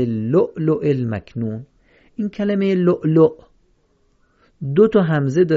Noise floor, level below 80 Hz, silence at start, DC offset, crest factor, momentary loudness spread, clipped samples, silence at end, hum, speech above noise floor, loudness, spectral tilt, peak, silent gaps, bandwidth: -60 dBFS; -52 dBFS; 0 s; under 0.1%; 16 dB; 13 LU; under 0.1%; 0 s; none; 43 dB; -18 LUFS; -9 dB/octave; -2 dBFS; none; 7.4 kHz